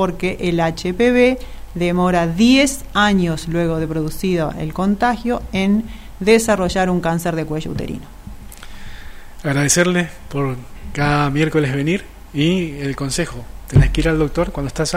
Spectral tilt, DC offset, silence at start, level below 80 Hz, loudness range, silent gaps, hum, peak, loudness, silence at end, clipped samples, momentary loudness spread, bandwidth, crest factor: -5 dB/octave; under 0.1%; 0 s; -32 dBFS; 5 LU; none; none; -2 dBFS; -18 LUFS; 0 s; under 0.1%; 16 LU; 16 kHz; 16 dB